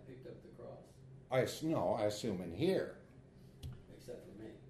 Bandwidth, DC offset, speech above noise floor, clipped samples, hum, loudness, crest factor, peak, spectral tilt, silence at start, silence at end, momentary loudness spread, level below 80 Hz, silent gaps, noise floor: 13 kHz; under 0.1%; 23 dB; under 0.1%; none; -37 LUFS; 20 dB; -22 dBFS; -6 dB/octave; 0 s; 0 s; 22 LU; -64 dBFS; none; -59 dBFS